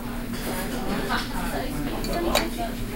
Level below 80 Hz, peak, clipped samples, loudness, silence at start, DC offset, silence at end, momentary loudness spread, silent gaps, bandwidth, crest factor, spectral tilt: -34 dBFS; -6 dBFS; under 0.1%; -28 LUFS; 0 s; under 0.1%; 0 s; 6 LU; none; 17 kHz; 22 dB; -4 dB/octave